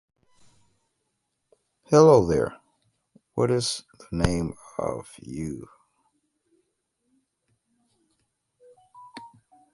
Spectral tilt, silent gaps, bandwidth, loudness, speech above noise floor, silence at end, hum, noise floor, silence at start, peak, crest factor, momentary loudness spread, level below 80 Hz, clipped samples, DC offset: -6 dB/octave; none; 11.5 kHz; -23 LUFS; 55 dB; 0.45 s; none; -78 dBFS; 1.9 s; -4 dBFS; 24 dB; 25 LU; -48 dBFS; under 0.1%; under 0.1%